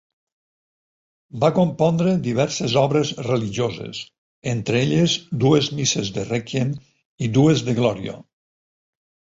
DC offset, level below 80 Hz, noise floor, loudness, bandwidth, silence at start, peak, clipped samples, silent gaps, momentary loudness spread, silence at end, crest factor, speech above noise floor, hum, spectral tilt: under 0.1%; -54 dBFS; under -90 dBFS; -20 LUFS; 8 kHz; 1.35 s; -4 dBFS; under 0.1%; 4.18-4.42 s, 7.05-7.18 s; 14 LU; 1.15 s; 18 dB; over 70 dB; none; -5.5 dB/octave